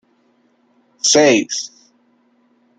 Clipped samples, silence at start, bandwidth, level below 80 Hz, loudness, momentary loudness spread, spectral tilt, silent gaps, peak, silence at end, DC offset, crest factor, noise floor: under 0.1%; 1.05 s; 11 kHz; -66 dBFS; -14 LUFS; 14 LU; -2 dB/octave; none; -2 dBFS; 1.1 s; under 0.1%; 18 dB; -59 dBFS